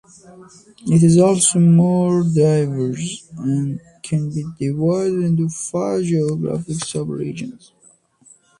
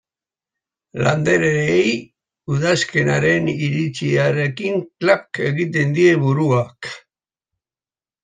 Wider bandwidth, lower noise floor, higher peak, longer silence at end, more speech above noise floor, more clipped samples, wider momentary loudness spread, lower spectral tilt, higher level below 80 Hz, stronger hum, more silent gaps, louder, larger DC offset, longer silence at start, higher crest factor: first, 11.5 kHz vs 9.4 kHz; second, -54 dBFS vs under -90 dBFS; about the same, -2 dBFS vs -2 dBFS; second, 1.05 s vs 1.25 s; second, 36 dB vs over 72 dB; neither; first, 14 LU vs 11 LU; about the same, -6.5 dB/octave vs -6 dB/octave; about the same, -56 dBFS vs -54 dBFS; neither; neither; about the same, -18 LUFS vs -18 LUFS; neither; second, 0.3 s vs 0.95 s; about the same, 16 dB vs 16 dB